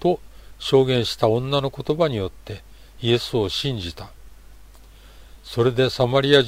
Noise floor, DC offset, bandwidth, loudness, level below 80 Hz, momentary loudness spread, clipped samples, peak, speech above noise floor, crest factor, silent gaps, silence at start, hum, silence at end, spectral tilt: -45 dBFS; under 0.1%; 16 kHz; -21 LUFS; -46 dBFS; 16 LU; under 0.1%; -2 dBFS; 25 dB; 20 dB; none; 0 s; none; 0 s; -6 dB/octave